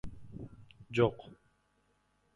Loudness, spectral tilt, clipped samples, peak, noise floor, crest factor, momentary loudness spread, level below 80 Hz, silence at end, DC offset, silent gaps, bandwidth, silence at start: -32 LUFS; -7.5 dB/octave; under 0.1%; -14 dBFS; -74 dBFS; 24 dB; 21 LU; -58 dBFS; 1 s; under 0.1%; none; 10.5 kHz; 0.05 s